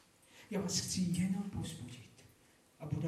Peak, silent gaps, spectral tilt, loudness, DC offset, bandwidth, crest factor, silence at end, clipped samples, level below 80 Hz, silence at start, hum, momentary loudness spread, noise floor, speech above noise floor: -22 dBFS; none; -4.5 dB/octave; -38 LUFS; under 0.1%; 15 kHz; 18 dB; 0 s; under 0.1%; -64 dBFS; 0.35 s; none; 19 LU; -67 dBFS; 29 dB